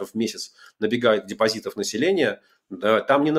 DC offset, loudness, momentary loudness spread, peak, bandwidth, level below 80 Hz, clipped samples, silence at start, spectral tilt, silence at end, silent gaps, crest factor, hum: under 0.1%; -23 LUFS; 15 LU; -4 dBFS; 15.5 kHz; -70 dBFS; under 0.1%; 0 s; -4 dB/octave; 0 s; none; 18 dB; none